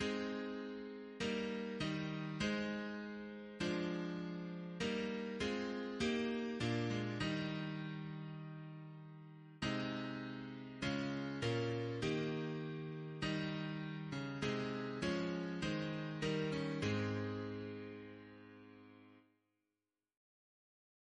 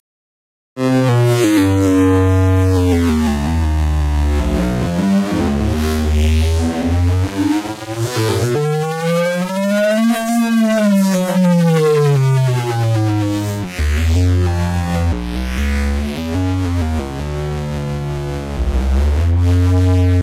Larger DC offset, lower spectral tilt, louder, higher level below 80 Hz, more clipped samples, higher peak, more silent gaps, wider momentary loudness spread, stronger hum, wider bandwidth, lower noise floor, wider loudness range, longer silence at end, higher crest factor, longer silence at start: neither; about the same, -6 dB/octave vs -7 dB/octave; second, -42 LUFS vs -16 LUFS; second, -66 dBFS vs -22 dBFS; neither; second, -26 dBFS vs -4 dBFS; neither; first, 12 LU vs 9 LU; neither; second, 10.5 kHz vs 15.5 kHz; about the same, under -90 dBFS vs under -90 dBFS; about the same, 5 LU vs 5 LU; first, 1.95 s vs 0 s; first, 16 dB vs 10 dB; second, 0 s vs 0.75 s